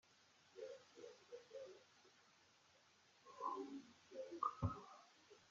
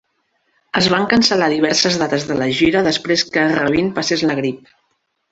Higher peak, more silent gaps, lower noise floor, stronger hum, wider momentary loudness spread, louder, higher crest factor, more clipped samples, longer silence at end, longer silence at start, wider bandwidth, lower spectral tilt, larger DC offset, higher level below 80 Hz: second, -28 dBFS vs 0 dBFS; neither; first, -74 dBFS vs -68 dBFS; neither; first, 21 LU vs 5 LU; second, -52 LUFS vs -16 LUFS; first, 24 dB vs 16 dB; neither; second, 0 s vs 0.75 s; second, 0.05 s vs 0.75 s; second, 7.4 kHz vs 8.2 kHz; first, -6 dB/octave vs -4 dB/octave; neither; second, -74 dBFS vs -50 dBFS